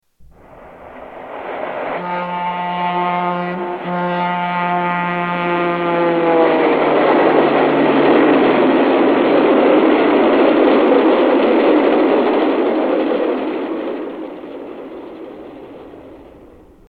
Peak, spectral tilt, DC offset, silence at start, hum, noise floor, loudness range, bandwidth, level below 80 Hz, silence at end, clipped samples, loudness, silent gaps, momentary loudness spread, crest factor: 0 dBFS; -8.5 dB/octave; under 0.1%; 0.55 s; none; -44 dBFS; 10 LU; 4.9 kHz; -54 dBFS; 0.65 s; under 0.1%; -15 LUFS; none; 19 LU; 14 dB